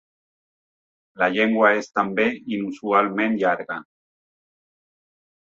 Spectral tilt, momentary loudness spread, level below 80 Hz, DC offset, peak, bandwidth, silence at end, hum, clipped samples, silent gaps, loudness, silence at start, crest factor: -5.5 dB/octave; 10 LU; -68 dBFS; under 0.1%; -4 dBFS; 7.6 kHz; 1.6 s; none; under 0.1%; none; -21 LUFS; 1.2 s; 20 dB